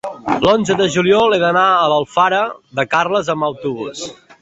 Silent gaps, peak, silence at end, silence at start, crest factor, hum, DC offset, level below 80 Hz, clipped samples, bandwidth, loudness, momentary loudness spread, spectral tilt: none; 0 dBFS; 0.3 s; 0.05 s; 14 dB; none; under 0.1%; -50 dBFS; under 0.1%; 8.2 kHz; -15 LUFS; 11 LU; -4.5 dB/octave